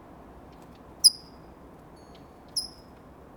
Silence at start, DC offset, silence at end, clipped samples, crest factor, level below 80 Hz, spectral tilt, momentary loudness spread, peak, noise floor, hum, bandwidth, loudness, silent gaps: 1.05 s; under 0.1%; 0.7 s; under 0.1%; 28 dB; -58 dBFS; 0 dB/octave; 21 LU; -4 dBFS; -50 dBFS; none; over 20 kHz; -23 LUFS; none